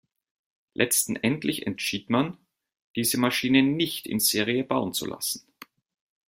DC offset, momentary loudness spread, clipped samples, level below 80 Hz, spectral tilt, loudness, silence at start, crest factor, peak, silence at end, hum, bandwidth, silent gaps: under 0.1%; 9 LU; under 0.1%; -64 dBFS; -3.5 dB/octave; -25 LUFS; 0.8 s; 22 dB; -6 dBFS; 0.9 s; none; 16.5 kHz; 2.82-2.94 s